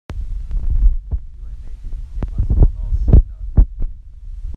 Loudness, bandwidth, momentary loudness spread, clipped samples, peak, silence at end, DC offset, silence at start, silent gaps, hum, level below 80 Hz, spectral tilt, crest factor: -20 LUFS; 2 kHz; 21 LU; under 0.1%; 0 dBFS; 0 s; under 0.1%; 0.1 s; none; none; -18 dBFS; -11 dB/octave; 16 dB